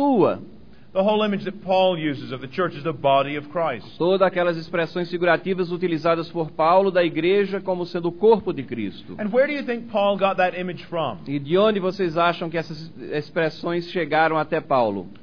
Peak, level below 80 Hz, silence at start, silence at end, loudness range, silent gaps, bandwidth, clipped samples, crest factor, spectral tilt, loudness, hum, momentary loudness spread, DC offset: -4 dBFS; -58 dBFS; 0 s; 0.05 s; 2 LU; none; 5.4 kHz; under 0.1%; 18 dB; -7.5 dB/octave; -22 LUFS; none; 10 LU; 0.6%